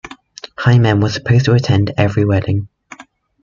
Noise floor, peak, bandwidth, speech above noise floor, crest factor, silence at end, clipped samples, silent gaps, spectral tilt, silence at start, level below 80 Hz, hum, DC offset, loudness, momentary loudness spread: -40 dBFS; -2 dBFS; 7.4 kHz; 27 dB; 14 dB; 0.4 s; under 0.1%; none; -7 dB/octave; 0.05 s; -42 dBFS; none; under 0.1%; -14 LUFS; 21 LU